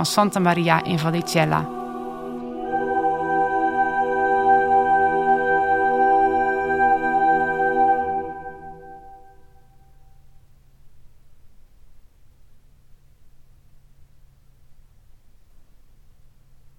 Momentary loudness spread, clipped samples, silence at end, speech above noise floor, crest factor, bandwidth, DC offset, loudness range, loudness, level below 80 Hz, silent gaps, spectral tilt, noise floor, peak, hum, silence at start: 14 LU; under 0.1%; 0.55 s; 30 dB; 22 dB; 16 kHz; under 0.1%; 7 LU; -20 LUFS; -52 dBFS; none; -5 dB/octave; -50 dBFS; 0 dBFS; none; 0 s